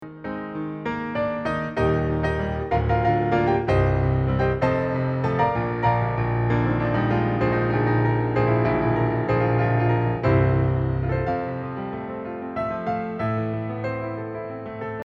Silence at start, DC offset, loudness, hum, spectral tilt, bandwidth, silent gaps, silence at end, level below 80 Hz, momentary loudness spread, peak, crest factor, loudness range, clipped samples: 0 s; under 0.1%; -23 LUFS; none; -9.5 dB/octave; 6 kHz; none; 0.05 s; -38 dBFS; 10 LU; -8 dBFS; 16 dB; 6 LU; under 0.1%